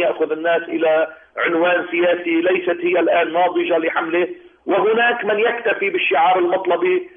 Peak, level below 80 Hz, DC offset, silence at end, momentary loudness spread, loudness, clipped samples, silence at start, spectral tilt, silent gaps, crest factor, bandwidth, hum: -6 dBFS; -66 dBFS; under 0.1%; 0.1 s; 5 LU; -18 LUFS; under 0.1%; 0 s; -8 dB/octave; none; 12 dB; 3.7 kHz; none